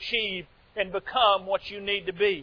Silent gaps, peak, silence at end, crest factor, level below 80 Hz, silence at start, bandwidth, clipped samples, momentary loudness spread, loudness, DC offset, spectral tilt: none; -10 dBFS; 0 s; 18 dB; -58 dBFS; 0 s; 5.4 kHz; under 0.1%; 10 LU; -27 LUFS; under 0.1%; -5 dB/octave